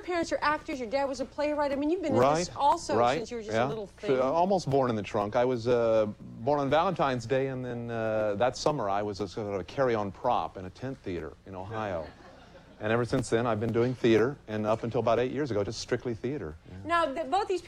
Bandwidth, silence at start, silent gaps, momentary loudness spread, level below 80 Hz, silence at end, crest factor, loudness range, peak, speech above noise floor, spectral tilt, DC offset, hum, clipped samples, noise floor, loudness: 12 kHz; 0 s; none; 10 LU; -56 dBFS; 0 s; 16 dB; 6 LU; -12 dBFS; 23 dB; -6 dB/octave; under 0.1%; none; under 0.1%; -52 dBFS; -29 LUFS